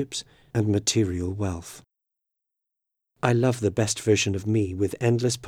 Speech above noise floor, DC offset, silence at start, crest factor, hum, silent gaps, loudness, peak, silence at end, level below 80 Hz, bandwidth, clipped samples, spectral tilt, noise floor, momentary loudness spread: 60 dB; under 0.1%; 0 s; 22 dB; none; none; -25 LUFS; -4 dBFS; 0 s; -54 dBFS; 15 kHz; under 0.1%; -5 dB/octave; -84 dBFS; 9 LU